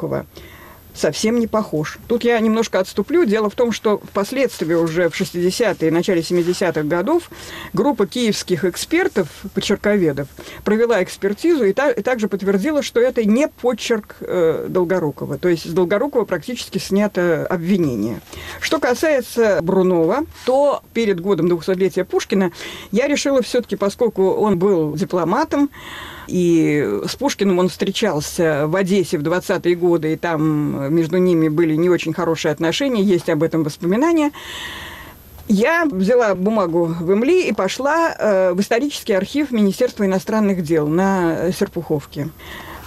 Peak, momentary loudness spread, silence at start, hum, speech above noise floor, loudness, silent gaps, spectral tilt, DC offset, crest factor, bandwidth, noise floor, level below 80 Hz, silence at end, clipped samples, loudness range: -8 dBFS; 8 LU; 0 s; none; 21 dB; -18 LUFS; none; -5.5 dB/octave; under 0.1%; 10 dB; 15 kHz; -38 dBFS; -48 dBFS; 0 s; under 0.1%; 2 LU